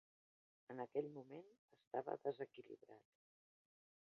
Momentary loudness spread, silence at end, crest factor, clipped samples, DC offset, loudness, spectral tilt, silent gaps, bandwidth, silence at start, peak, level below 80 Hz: 18 LU; 1.15 s; 22 dB; under 0.1%; under 0.1%; -50 LUFS; -6 dB/octave; 1.59-1.68 s, 1.87-1.91 s; 6 kHz; 0.7 s; -30 dBFS; under -90 dBFS